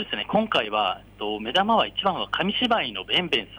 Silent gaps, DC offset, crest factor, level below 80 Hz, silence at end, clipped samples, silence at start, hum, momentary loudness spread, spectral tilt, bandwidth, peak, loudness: none; under 0.1%; 16 dB; -54 dBFS; 0 s; under 0.1%; 0 s; none; 6 LU; -5 dB/octave; over 20 kHz; -10 dBFS; -24 LUFS